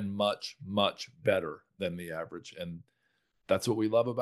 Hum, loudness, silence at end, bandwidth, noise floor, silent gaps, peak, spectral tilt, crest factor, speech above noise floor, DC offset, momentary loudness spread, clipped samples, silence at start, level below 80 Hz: none; -32 LUFS; 0 s; 12.5 kHz; -77 dBFS; none; -12 dBFS; -5 dB/octave; 22 dB; 45 dB; under 0.1%; 14 LU; under 0.1%; 0 s; -70 dBFS